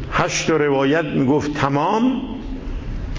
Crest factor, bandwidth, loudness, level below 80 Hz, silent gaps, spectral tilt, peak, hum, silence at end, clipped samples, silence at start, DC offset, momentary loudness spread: 14 dB; 7.6 kHz; -19 LUFS; -32 dBFS; none; -5.5 dB/octave; -4 dBFS; none; 0 s; under 0.1%; 0 s; under 0.1%; 13 LU